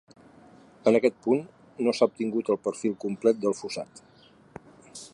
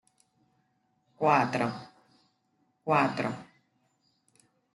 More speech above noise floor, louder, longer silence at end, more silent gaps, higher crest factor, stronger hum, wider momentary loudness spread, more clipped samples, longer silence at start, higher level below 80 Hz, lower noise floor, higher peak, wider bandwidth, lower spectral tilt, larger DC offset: second, 28 dB vs 47 dB; about the same, -27 LUFS vs -28 LUFS; second, 0.05 s vs 1.3 s; neither; about the same, 20 dB vs 24 dB; neither; about the same, 17 LU vs 17 LU; neither; second, 0.85 s vs 1.2 s; about the same, -72 dBFS vs -76 dBFS; second, -53 dBFS vs -74 dBFS; about the same, -8 dBFS vs -10 dBFS; about the same, 11.5 kHz vs 12 kHz; about the same, -5.5 dB/octave vs -6.5 dB/octave; neither